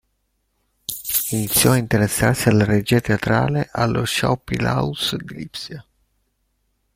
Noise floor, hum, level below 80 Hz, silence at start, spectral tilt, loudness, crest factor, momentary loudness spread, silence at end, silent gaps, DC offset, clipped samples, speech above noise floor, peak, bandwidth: -70 dBFS; none; -44 dBFS; 0.9 s; -4.5 dB/octave; -19 LUFS; 18 dB; 15 LU; 1.15 s; none; under 0.1%; under 0.1%; 51 dB; -2 dBFS; 16.5 kHz